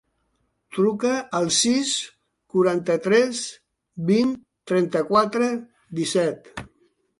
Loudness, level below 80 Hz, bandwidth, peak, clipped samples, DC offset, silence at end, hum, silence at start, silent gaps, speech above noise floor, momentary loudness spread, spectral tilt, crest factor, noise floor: -22 LUFS; -62 dBFS; 11.5 kHz; -6 dBFS; under 0.1%; under 0.1%; 0.55 s; none; 0.7 s; none; 50 dB; 15 LU; -4 dB/octave; 18 dB; -71 dBFS